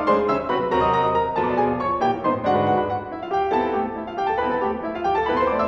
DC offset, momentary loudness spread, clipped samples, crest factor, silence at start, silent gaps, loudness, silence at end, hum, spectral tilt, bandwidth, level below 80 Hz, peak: under 0.1%; 6 LU; under 0.1%; 14 dB; 0 s; none; -22 LUFS; 0 s; none; -7.5 dB/octave; 7.4 kHz; -46 dBFS; -6 dBFS